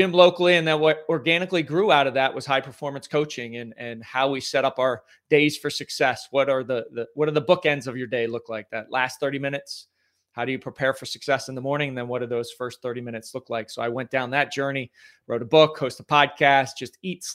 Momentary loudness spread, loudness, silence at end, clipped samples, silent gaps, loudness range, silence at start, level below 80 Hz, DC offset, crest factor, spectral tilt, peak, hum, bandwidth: 14 LU; -23 LUFS; 0 s; under 0.1%; none; 6 LU; 0 s; -70 dBFS; under 0.1%; 22 dB; -4.5 dB/octave; 0 dBFS; none; 16 kHz